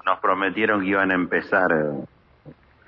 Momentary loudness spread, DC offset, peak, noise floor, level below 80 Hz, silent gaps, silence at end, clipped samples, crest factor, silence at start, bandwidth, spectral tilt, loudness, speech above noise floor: 8 LU; under 0.1%; -6 dBFS; -48 dBFS; -60 dBFS; none; 0.35 s; under 0.1%; 18 dB; 0.05 s; 6 kHz; -8 dB/octave; -21 LUFS; 27 dB